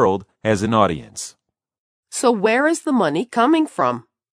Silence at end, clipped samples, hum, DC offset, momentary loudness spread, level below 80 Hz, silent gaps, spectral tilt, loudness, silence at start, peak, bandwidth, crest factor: 0.35 s; under 0.1%; none; under 0.1%; 14 LU; -54 dBFS; 1.78-2.03 s; -5 dB/octave; -19 LUFS; 0 s; 0 dBFS; 13.5 kHz; 18 dB